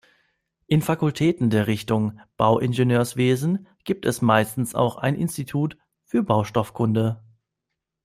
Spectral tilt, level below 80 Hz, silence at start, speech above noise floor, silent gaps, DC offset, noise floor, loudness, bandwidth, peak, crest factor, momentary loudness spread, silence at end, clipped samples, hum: -6.5 dB/octave; -56 dBFS; 0.7 s; 61 dB; none; under 0.1%; -82 dBFS; -23 LUFS; 16 kHz; -4 dBFS; 20 dB; 7 LU; 0.85 s; under 0.1%; none